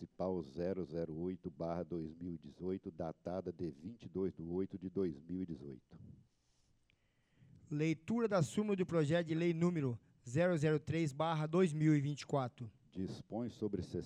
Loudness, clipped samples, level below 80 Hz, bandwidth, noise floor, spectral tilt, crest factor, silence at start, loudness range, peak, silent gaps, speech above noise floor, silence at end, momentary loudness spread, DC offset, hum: -39 LUFS; under 0.1%; -70 dBFS; 11 kHz; -76 dBFS; -7.5 dB/octave; 16 dB; 0 s; 9 LU; -22 dBFS; none; 38 dB; 0 s; 12 LU; under 0.1%; none